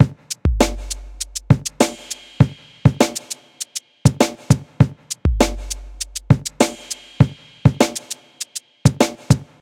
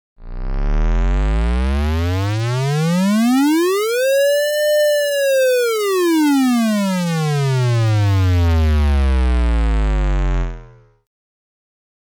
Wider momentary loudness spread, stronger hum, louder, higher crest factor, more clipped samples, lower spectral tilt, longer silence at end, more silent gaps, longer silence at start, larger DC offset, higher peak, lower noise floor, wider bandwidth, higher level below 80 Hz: first, 13 LU vs 5 LU; neither; second, -20 LUFS vs -17 LUFS; first, 18 dB vs 4 dB; neither; about the same, -5.5 dB/octave vs -6 dB/octave; second, 0.2 s vs 1.5 s; neither; second, 0 s vs 0.2 s; neither; first, 0 dBFS vs -12 dBFS; second, -35 dBFS vs -41 dBFS; second, 16.5 kHz vs over 20 kHz; second, -32 dBFS vs -20 dBFS